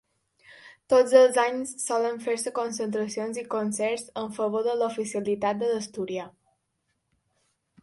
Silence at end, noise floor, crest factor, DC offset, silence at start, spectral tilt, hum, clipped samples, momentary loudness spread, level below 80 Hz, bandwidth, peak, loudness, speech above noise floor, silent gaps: 1.55 s; -77 dBFS; 22 dB; under 0.1%; 0.5 s; -4 dB/octave; none; under 0.1%; 13 LU; -74 dBFS; 11.5 kHz; -6 dBFS; -26 LUFS; 51 dB; none